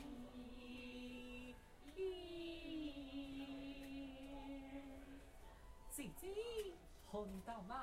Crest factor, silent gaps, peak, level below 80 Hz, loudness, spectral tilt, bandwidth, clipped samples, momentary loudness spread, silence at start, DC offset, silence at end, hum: 16 dB; none; -36 dBFS; -62 dBFS; -52 LUFS; -4.5 dB/octave; 16 kHz; under 0.1%; 11 LU; 0 s; under 0.1%; 0 s; none